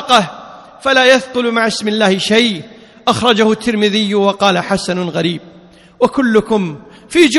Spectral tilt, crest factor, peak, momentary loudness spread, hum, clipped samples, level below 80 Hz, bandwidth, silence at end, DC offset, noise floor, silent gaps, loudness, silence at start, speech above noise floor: -4 dB/octave; 14 dB; 0 dBFS; 10 LU; none; 0.3%; -50 dBFS; 12.5 kHz; 0 s; under 0.1%; -42 dBFS; none; -13 LUFS; 0 s; 29 dB